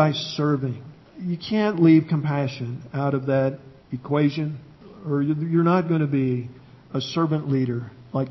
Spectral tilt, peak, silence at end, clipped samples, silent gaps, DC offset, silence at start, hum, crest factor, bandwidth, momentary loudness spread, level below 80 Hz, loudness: -8 dB/octave; -4 dBFS; 0 s; under 0.1%; none; under 0.1%; 0 s; none; 18 dB; 6 kHz; 15 LU; -60 dBFS; -23 LUFS